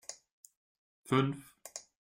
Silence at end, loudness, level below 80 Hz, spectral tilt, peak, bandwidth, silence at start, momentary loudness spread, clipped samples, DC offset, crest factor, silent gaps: 0.35 s; -33 LUFS; -74 dBFS; -5.5 dB/octave; -16 dBFS; 16.5 kHz; 0.1 s; 17 LU; under 0.1%; under 0.1%; 22 dB; 0.31-0.44 s, 0.57-1.04 s